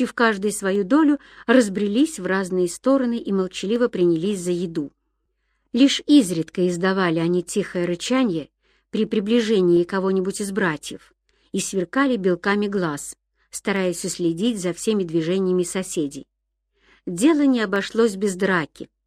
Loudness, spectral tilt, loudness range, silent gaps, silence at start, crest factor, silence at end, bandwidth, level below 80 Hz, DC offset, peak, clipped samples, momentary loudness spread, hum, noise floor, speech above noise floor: -21 LUFS; -5 dB/octave; 3 LU; none; 0 s; 18 dB; 0.2 s; 14.5 kHz; -60 dBFS; under 0.1%; -2 dBFS; under 0.1%; 11 LU; none; -73 dBFS; 53 dB